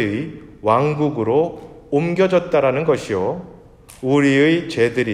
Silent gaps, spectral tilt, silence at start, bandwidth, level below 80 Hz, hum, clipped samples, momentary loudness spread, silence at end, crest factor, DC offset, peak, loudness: none; -6.5 dB/octave; 0 s; 12 kHz; -52 dBFS; none; under 0.1%; 11 LU; 0 s; 16 dB; under 0.1%; -2 dBFS; -18 LUFS